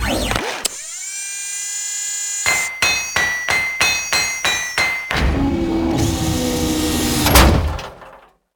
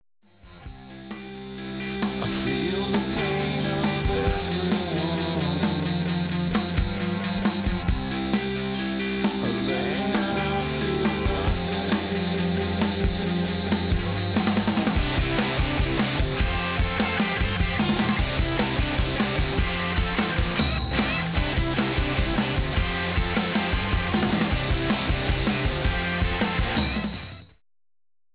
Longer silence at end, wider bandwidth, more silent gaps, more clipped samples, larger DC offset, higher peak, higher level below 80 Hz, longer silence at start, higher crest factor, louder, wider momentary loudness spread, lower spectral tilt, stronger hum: second, 0.4 s vs 0.9 s; first, over 20 kHz vs 4 kHz; neither; neither; neither; first, 0 dBFS vs -10 dBFS; first, -26 dBFS vs -32 dBFS; second, 0 s vs 0.45 s; about the same, 18 dB vs 16 dB; first, -17 LUFS vs -25 LUFS; first, 9 LU vs 4 LU; second, -3 dB/octave vs -10 dB/octave; neither